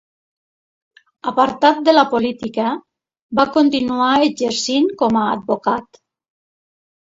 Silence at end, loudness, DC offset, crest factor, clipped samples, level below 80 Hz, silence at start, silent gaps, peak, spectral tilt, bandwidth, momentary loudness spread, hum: 1.3 s; -17 LUFS; under 0.1%; 18 dB; under 0.1%; -58 dBFS; 1.25 s; 3.22-3.29 s; 0 dBFS; -4 dB/octave; 8 kHz; 9 LU; none